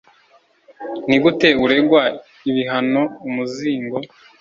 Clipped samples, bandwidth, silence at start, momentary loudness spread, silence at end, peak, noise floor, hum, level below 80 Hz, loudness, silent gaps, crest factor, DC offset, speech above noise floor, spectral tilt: under 0.1%; 7.6 kHz; 0.8 s; 14 LU; 0.35 s; 0 dBFS; -55 dBFS; none; -56 dBFS; -18 LUFS; none; 18 dB; under 0.1%; 38 dB; -6 dB/octave